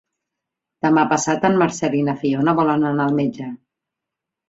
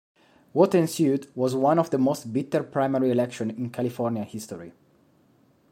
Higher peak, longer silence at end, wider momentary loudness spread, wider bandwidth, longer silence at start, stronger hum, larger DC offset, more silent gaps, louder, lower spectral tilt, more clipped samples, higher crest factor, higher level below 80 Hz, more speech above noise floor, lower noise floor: first, -2 dBFS vs -6 dBFS; about the same, 0.95 s vs 1 s; second, 7 LU vs 11 LU; second, 8 kHz vs 16.5 kHz; first, 0.85 s vs 0.55 s; neither; neither; neither; first, -18 LUFS vs -25 LUFS; about the same, -5.5 dB/octave vs -6.5 dB/octave; neither; about the same, 18 dB vs 20 dB; first, -60 dBFS vs -70 dBFS; first, 66 dB vs 37 dB; first, -84 dBFS vs -61 dBFS